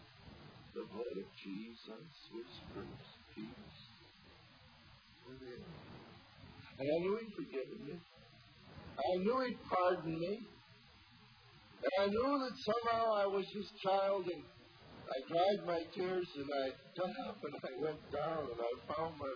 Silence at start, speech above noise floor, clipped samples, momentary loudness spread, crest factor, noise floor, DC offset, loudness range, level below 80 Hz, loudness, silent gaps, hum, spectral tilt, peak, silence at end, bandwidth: 0 s; 24 dB; under 0.1%; 24 LU; 18 dB; -63 dBFS; under 0.1%; 17 LU; -70 dBFS; -39 LUFS; none; none; -4 dB/octave; -22 dBFS; 0 s; 5.4 kHz